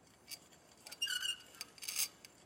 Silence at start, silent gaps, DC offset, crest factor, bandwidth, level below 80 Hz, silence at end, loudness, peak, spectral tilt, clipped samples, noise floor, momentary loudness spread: 0.1 s; none; under 0.1%; 24 dB; 16.5 kHz; -82 dBFS; 0 s; -39 LUFS; -20 dBFS; 2 dB/octave; under 0.1%; -63 dBFS; 15 LU